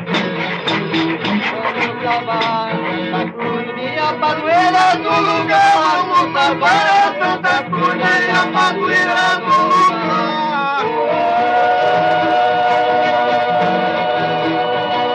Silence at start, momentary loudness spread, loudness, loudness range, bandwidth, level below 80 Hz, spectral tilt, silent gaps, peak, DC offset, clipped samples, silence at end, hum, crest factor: 0 s; 6 LU; -15 LUFS; 5 LU; 10 kHz; -60 dBFS; -4.5 dB/octave; none; -2 dBFS; under 0.1%; under 0.1%; 0 s; none; 12 dB